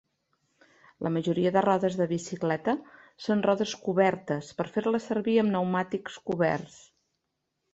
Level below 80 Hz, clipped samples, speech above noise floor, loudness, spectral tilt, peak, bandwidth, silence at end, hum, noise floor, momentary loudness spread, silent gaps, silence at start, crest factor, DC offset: -68 dBFS; under 0.1%; 54 dB; -28 LUFS; -6.5 dB/octave; -10 dBFS; 8.2 kHz; 1.05 s; none; -81 dBFS; 9 LU; none; 1 s; 20 dB; under 0.1%